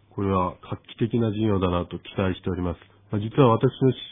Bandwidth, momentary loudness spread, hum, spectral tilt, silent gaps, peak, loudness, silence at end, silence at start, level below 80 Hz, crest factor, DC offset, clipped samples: 3.8 kHz; 13 LU; none; -11.5 dB/octave; none; -4 dBFS; -24 LUFS; 0 s; 0.15 s; -48 dBFS; 20 dB; under 0.1%; under 0.1%